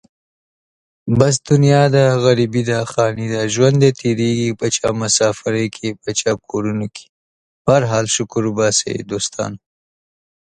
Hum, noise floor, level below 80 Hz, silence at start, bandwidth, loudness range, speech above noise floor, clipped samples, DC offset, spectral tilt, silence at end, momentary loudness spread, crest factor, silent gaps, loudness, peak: none; under -90 dBFS; -50 dBFS; 1.05 s; 11 kHz; 4 LU; over 74 dB; under 0.1%; under 0.1%; -5 dB/octave; 1 s; 10 LU; 16 dB; 7.09-7.65 s; -16 LUFS; 0 dBFS